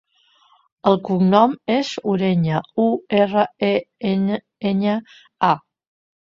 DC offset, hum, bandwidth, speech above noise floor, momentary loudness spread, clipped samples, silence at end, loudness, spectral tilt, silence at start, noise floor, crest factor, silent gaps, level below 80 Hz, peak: under 0.1%; none; 7.6 kHz; 39 dB; 7 LU; under 0.1%; 0.7 s; -20 LUFS; -7.5 dB/octave; 0.85 s; -58 dBFS; 18 dB; none; -60 dBFS; -2 dBFS